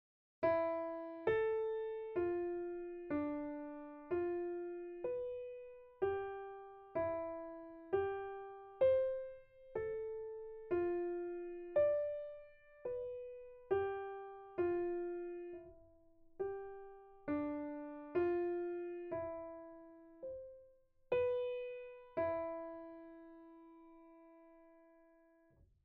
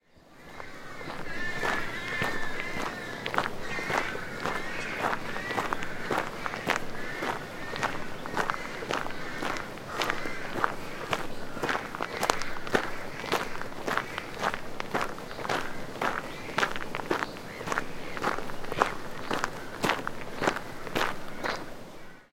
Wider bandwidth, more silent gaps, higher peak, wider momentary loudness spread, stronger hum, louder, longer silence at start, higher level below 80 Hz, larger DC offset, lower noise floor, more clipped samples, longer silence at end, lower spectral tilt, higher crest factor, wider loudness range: second, 4.6 kHz vs 16.5 kHz; neither; second, -24 dBFS vs -2 dBFS; first, 18 LU vs 8 LU; neither; second, -41 LUFS vs -32 LUFS; first, 0.4 s vs 0.1 s; second, -70 dBFS vs -46 dBFS; neither; first, -70 dBFS vs -52 dBFS; neither; first, 1.05 s vs 0.05 s; first, -5.5 dB/octave vs -3.5 dB/octave; second, 18 dB vs 30 dB; first, 5 LU vs 1 LU